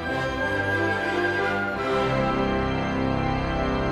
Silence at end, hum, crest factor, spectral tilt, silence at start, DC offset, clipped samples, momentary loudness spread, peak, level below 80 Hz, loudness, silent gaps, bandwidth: 0 s; none; 14 dB; -6.5 dB/octave; 0 s; under 0.1%; under 0.1%; 2 LU; -12 dBFS; -38 dBFS; -24 LUFS; none; 13 kHz